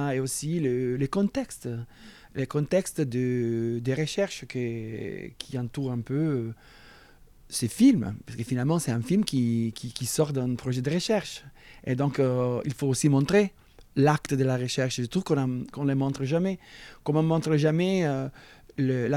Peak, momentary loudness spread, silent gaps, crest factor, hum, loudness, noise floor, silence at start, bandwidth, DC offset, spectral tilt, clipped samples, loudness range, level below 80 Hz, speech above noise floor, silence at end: -6 dBFS; 12 LU; none; 20 dB; none; -27 LUFS; -53 dBFS; 0 s; 15.5 kHz; under 0.1%; -6 dB/octave; under 0.1%; 4 LU; -56 dBFS; 27 dB; 0 s